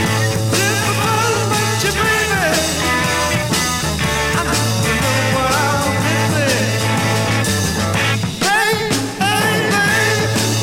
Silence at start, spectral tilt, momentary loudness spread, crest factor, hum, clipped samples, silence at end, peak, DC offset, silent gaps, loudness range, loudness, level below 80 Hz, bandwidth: 0 s; -3.5 dB/octave; 3 LU; 14 dB; none; under 0.1%; 0 s; -2 dBFS; under 0.1%; none; 1 LU; -15 LUFS; -36 dBFS; 16.5 kHz